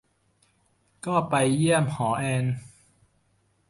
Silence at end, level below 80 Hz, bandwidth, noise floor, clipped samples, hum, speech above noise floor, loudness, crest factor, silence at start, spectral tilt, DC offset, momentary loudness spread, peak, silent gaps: 1 s; -62 dBFS; 11.5 kHz; -68 dBFS; under 0.1%; none; 44 dB; -25 LUFS; 18 dB; 1.05 s; -5.5 dB/octave; under 0.1%; 10 LU; -10 dBFS; none